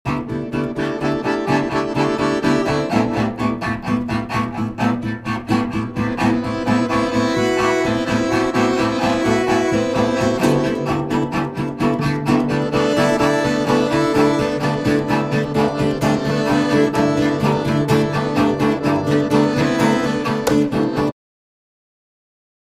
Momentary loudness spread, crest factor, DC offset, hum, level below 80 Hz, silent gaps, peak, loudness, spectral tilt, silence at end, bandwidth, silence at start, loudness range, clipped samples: 5 LU; 16 dB; under 0.1%; none; -42 dBFS; none; -2 dBFS; -18 LUFS; -6 dB/octave; 1.55 s; 15.5 kHz; 0.05 s; 3 LU; under 0.1%